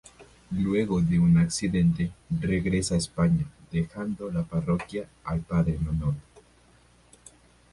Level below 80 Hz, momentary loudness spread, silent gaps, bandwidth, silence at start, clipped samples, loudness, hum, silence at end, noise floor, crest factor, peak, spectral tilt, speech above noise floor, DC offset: -44 dBFS; 10 LU; none; 11.5 kHz; 0.2 s; under 0.1%; -27 LUFS; none; 1.55 s; -58 dBFS; 14 dB; -12 dBFS; -6.5 dB/octave; 33 dB; under 0.1%